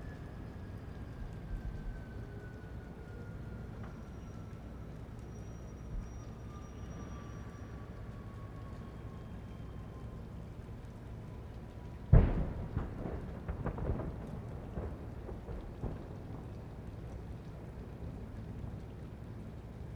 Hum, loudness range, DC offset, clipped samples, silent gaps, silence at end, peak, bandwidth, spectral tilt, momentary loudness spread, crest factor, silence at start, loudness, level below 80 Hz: none; 12 LU; under 0.1%; under 0.1%; none; 0 s; -12 dBFS; 9.2 kHz; -8.5 dB/octave; 8 LU; 28 dB; 0 s; -43 LUFS; -44 dBFS